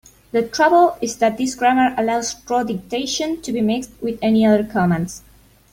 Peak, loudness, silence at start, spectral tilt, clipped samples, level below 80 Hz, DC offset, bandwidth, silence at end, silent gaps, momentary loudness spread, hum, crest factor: -2 dBFS; -18 LUFS; 0.35 s; -5 dB/octave; under 0.1%; -50 dBFS; under 0.1%; 16.5 kHz; 0.55 s; none; 9 LU; none; 16 dB